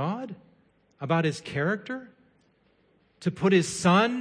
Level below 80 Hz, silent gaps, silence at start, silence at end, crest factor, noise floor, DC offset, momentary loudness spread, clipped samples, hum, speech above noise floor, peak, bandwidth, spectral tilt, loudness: -64 dBFS; none; 0 s; 0 s; 20 dB; -66 dBFS; under 0.1%; 17 LU; under 0.1%; none; 40 dB; -8 dBFS; 10.5 kHz; -5.5 dB/octave; -26 LUFS